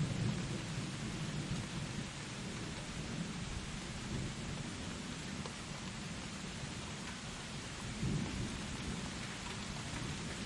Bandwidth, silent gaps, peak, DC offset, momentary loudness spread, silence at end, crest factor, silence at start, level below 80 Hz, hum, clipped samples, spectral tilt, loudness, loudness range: 11.5 kHz; none; -26 dBFS; under 0.1%; 5 LU; 0 s; 16 dB; 0 s; -54 dBFS; none; under 0.1%; -4.5 dB/octave; -42 LUFS; 2 LU